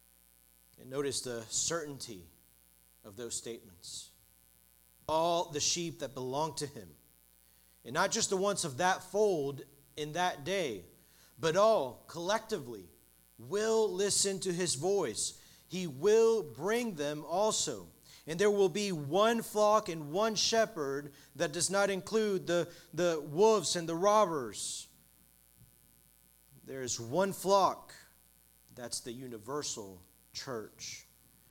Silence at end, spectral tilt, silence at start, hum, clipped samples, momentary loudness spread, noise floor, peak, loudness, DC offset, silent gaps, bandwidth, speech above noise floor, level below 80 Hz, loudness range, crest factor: 0.5 s; -3 dB/octave; 0.85 s; none; under 0.1%; 17 LU; -65 dBFS; -14 dBFS; -32 LUFS; under 0.1%; none; 18.5 kHz; 32 dB; -70 dBFS; 8 LU; 20 dB